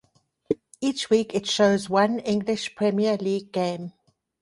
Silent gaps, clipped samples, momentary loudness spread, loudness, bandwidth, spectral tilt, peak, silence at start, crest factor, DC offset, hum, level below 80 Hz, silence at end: none; under 0.1%; 10 LU; -24 LUFS; 11.5 kHz; -5 dB/octave; -8 dBFS; 0.5 s; 18 dB; under 0.1%; none; -64 dBFS; 0.5 s